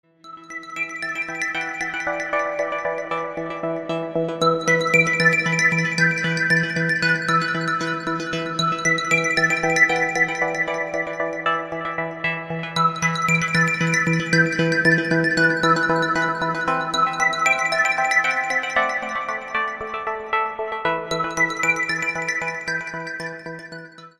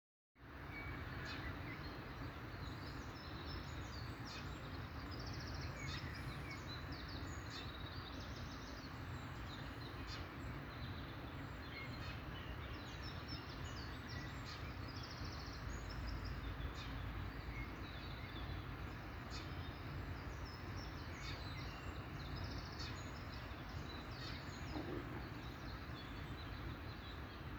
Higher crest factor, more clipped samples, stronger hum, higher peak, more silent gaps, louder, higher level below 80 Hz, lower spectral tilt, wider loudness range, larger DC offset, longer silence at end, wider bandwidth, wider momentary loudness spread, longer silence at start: about the same, 18 dB vs 16 dB; neither; neither; first, -4 dBFS vs -32 dBFS; neither; first, -20 LUFS vs -49 LUFS; about the same, -58 dBFS vs -54 dBFS; second, -4 dB/octave vs -5.5 dB/octave; first, 5 LU vs 1 LU; neither; about the same, 0.1 s vs 0 s; second, 12.5 kHz vs over 20 kHz; first, 10 LU vs 3 LU; about the same, 0.25 s vs 0.35 s